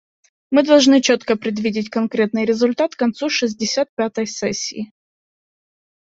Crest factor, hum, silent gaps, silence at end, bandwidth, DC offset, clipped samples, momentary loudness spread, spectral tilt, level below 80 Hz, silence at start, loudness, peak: 18 dB; none; 3.89-3.97 s; 1.15 s; 8 kHz; under 0.1%; under 0.1%; 10 LU; -3.5 dB/octave; -62 dBFS; 0.5 s; -18 LUFS; -2 dBFS